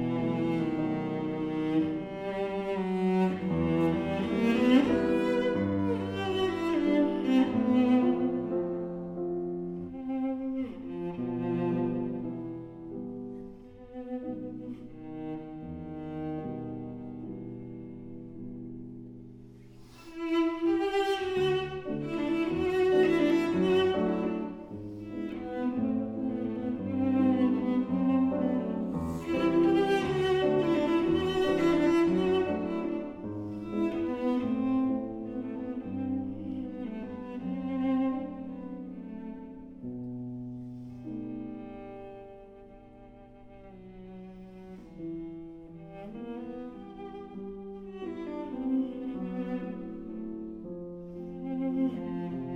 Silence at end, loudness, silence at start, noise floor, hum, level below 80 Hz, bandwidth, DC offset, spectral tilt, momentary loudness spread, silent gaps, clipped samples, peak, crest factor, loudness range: 0 s; -30 LUFS; 0 s; -51 dBFS; none; -56 dBFS; 9.8 kHz; under 0.1%; -7.5 dB/octave; 18 LU; none; under 0.1%; -10 dBFS; 20 dB; 15 LU